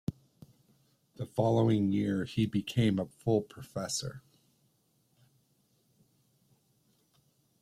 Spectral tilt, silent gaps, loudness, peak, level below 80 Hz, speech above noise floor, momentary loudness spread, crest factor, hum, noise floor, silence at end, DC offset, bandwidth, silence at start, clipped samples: -6 dB/octave; none; -31 LUFS; -14 dBFS; -64 dBFS; 42 dB; 14 LU; 20 dB; none; -73 dBFS; 3.4 s; under 0.1%; 14.5 kHz; 0.1 s; under 0.1%